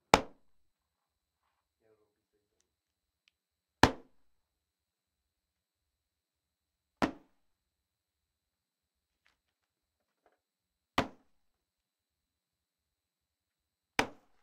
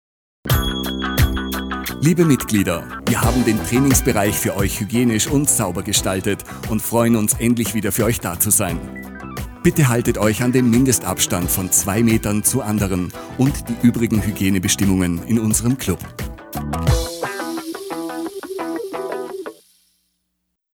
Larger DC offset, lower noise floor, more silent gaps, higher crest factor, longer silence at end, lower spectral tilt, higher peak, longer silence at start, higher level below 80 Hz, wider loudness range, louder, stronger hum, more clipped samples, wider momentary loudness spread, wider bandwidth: neither; first, -89 dBFS vs -74 dBFS; neither; first, 38 dB vs 16 dB; second, 0.35 s vs 1.25 s; about the same, -4 dB/octave vs -4.5 dB/octave; about the same, -4 dBFS vs -2 dBFS; second, 0.15 s vs 0.45 s; second, -60 dBFS vs -32 dBFS; about the same, 7 LU vs 8 LU; second, -33 LUFS vs -18 LUFS; neither; neither; first, 15 LU vs 12 LU; second, 12.5 kHz vs over 20 kHz